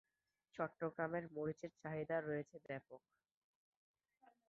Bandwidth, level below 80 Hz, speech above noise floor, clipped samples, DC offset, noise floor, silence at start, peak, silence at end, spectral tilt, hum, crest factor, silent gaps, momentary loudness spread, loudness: 7.2 kHz; -80 dBFS; 36 dB; under 0.1%; under 0.1%; -81 dBFS; 0.55 s; -26 dBFS; 1.5 s; -6.5 dB/octave; none; 22 dB; none; 11 LU; -46 LUFS